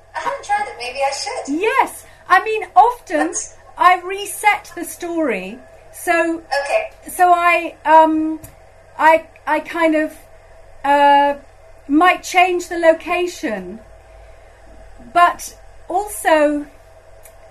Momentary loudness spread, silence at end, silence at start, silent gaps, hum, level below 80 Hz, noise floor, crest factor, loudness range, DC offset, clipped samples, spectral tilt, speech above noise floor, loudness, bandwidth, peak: 13 LU; 0.4 s; 0.15 s; none; none; -48 dBFS; -43 dBFS; 18 dB; 4 LU; under 0.1%; under 0.1%; -2.5 dB/octave; 26 dB; -16 LUFS; 13.5 kHz; 0 dBFS